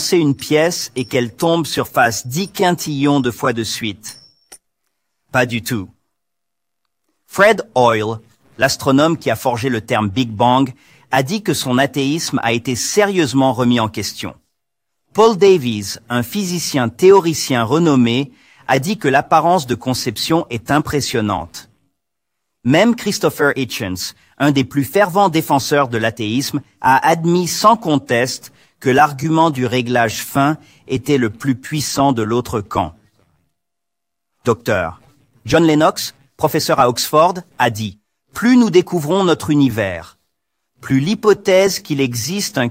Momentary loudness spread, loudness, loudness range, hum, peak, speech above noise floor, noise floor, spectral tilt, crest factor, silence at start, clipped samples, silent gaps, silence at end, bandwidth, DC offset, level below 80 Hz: 11 LU; -16 LUFS; 5 LU; none; 0 dBFS; 66 dB; -81 dBFS; -5 dB/octave; 16 dB; 0 s; under 0.1%; none; 0 s; 16.5 kHz; under 0.1%; -50 dBFS